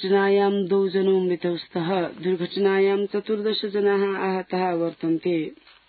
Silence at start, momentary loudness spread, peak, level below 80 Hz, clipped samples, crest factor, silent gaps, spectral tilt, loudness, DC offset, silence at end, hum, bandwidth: 0 s; 6 LU; -10 dBFS; -72 dBFS; under 0.1%; 12 dB; none; -11 dB/octave; -23 LUFS; under 0.1%; 0.35 s; none; 4.8 kHz